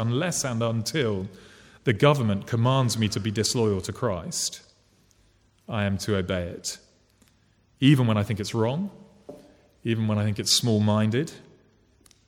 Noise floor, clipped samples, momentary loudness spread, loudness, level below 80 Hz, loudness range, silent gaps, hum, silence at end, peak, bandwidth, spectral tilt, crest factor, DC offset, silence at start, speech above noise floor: -63 dBFS; under 0.1%; 12 LU; -25 LUFS; -58 dBFS; 6 LU; none; none; 0.9 s; -6 dBFS; 17 kHz; -5 dB/octave; 20 dB; under 0.1%; 0 s; 39 dB